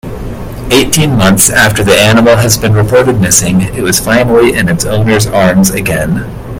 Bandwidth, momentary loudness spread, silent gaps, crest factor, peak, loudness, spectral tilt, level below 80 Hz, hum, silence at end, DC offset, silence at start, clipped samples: over 20 kHz; 8 LU; none; 8 dB; 0 dBFS; -8 LUFS; -4 dB/octave; -26 dBFS; none; 0 s; under 0.1%; 0.05 s; 0.9%